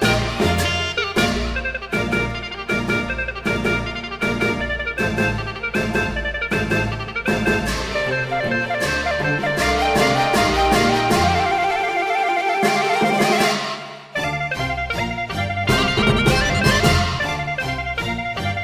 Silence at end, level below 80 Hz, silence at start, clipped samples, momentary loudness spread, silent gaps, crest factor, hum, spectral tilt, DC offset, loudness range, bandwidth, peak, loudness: 0 s; -32 dBFS; 0 s; under 0.1%; 7 LU; none; 18 dB; none; -4.5 dB/octave; under 0.1%; 4 LU; 16 kHz; -2 dBFS; -20 LUFS